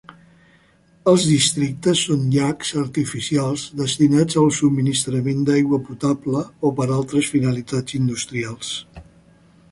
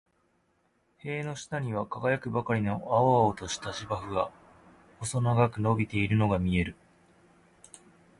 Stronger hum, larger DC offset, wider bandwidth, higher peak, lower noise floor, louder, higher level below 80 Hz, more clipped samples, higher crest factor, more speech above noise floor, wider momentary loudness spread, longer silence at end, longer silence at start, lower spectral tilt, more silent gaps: neither; neither; about the same, 11.5 kHz vs 11.5 kHz; first, -2 dBFS vs -10 dBFS; second, -55 dBFS vs -71 dBFS; first, -20 LUFS vs -29 LUFS; about the same, -54 dBFS vs -50 dBFS; neither; about the same, 18 dB vs 20 dB; second, 36 dB vs 43 dB; about the same, 8 LU vs 10 LU; second, 0.7 s vs 1.5 s; second, 0.1 s vs 1.05 s; about the same, -5 dB/octave vs -6 dB/octave; neither